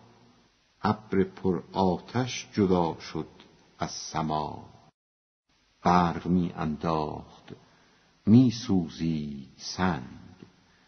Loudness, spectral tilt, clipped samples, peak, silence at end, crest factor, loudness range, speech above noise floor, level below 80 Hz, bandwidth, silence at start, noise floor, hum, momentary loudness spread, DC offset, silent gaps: -28 LUFS; -6.5 dB/octave; under 0.1%; -6 dBFS; 0.7 s; 22 dB; 5 LU; 37 dB; -56 dBFS; 6.4 kHz; 0.85 s; -64 dBFS; none; 15 LU; under 0.1%; 4.94-5.43 s